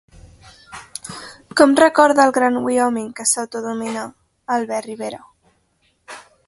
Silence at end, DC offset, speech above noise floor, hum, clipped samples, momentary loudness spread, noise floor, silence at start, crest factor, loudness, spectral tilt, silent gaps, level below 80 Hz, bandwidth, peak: 0.25 s; under 0.1%; 47 dB; none; under 0.1%; 26 LU; -63 dBFS; 0.7 s; 20 dB; -17 LUFS; -2.5 dB/octave; none; -58 dBFS; 12 kHz; 0 dBFS